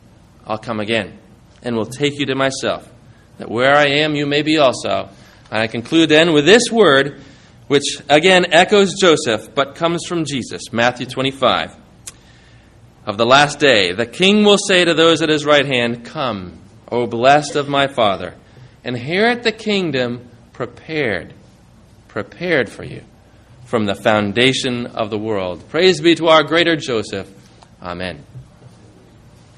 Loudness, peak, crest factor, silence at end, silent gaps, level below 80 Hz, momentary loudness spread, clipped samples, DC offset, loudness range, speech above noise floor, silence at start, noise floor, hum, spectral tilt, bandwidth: -15 LUFS; 0 dBFS; 16 dB; 0.9 s; none; -52 dBFS; 18 LU; under 0.1%; under 0.1%; 9 LU; 31 dB; 0.45 s; -46 dBFS; none; -4 dB/octave; 12 kHz